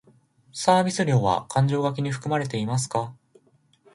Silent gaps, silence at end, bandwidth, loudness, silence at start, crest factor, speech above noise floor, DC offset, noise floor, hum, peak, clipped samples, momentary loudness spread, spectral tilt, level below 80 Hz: none; 0.8 s; 11.5 kHz; -24 LUFS; 0.55 s; 20 dB; 38 dB; under 0.1%; -61 dBFS; none; -4 dBFS; under 0.1%; 8 LU; -5.5 dB/octave; -58 dBFS